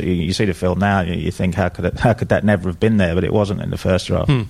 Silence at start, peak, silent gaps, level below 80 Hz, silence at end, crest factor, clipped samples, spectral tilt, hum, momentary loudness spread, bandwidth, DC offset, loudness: 0 s; -2 dBFS; none; -36 dBFS; 0 s; 16 dB; under 0.1%; -7 dB/octave; none; 4 LU; 14 kHz; under 0.1%; -18 LUFS